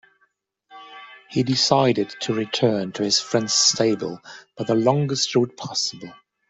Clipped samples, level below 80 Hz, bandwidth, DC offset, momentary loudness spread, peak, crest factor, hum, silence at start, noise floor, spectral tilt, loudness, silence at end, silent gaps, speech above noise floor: under 0.1%; -64 dBFS; 8.2 kHz; under 0.1%; 23 LU; -2 dBFS; 20 dB; none; 0.7 s; -67 dBFS; -3.5 dB/octave; -21 LUFS; 0.35 s; none; 46 dB